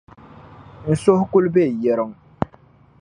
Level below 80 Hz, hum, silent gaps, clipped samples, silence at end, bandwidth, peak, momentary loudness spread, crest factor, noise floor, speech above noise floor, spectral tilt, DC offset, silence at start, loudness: -50 dBFS; none; none; under 0.1%; 0.55 s; 10.5 kHz; -2 dBFS; 13 LU; 20 dB; -51 dBFS; 34 dB; -8 dB/octave; under 0.1%; 0.6 s; -19 LUFS